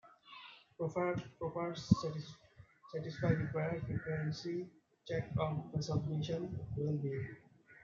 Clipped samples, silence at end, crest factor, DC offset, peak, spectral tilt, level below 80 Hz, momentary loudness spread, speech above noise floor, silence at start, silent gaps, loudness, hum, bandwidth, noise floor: under 0.1%; 0 s; 26 dB; under 0.1%; -14 dBFS; -7 dB/octave; -62 dBFS; 19 LU; 23 dB; 0.05 s; none; -39 LUFS; none; 7.4 kHz; -60 dBFS